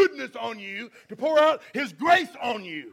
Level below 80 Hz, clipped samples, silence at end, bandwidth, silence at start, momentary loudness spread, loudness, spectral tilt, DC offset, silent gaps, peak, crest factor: -68 dBFS; under 0.1%; 0.05 s; 15.5 kHz; 0 s; 14 LU; -24 LUFS; -4 dB/octave; under 0.1%; none; -6 dBFS; 20 dB